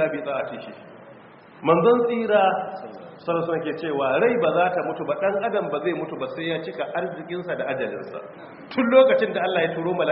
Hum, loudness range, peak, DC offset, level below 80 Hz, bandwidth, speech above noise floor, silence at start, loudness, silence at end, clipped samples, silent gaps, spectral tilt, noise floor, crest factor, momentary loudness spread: none; 5 LU; -4 dBFS; under 0.1%; -66 dBFS; 5.4 kHz; 24 dB; 0 s; -23 LUFS; 0 s; under 0.1%; none; -4 dB/octave; -47 dBFS; 20 dB; 16 LU